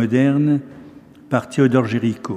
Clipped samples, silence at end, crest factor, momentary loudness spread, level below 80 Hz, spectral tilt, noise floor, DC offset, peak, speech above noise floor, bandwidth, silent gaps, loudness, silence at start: under 0.1%; 0 s; 16 dB; 7 LU; -64 dBFS; -8 dB/octave; -42 dBFS; under 0.1%; -2 dBFS; 25 dB; 10.5 kHz; none; -18 LUFS; 0 s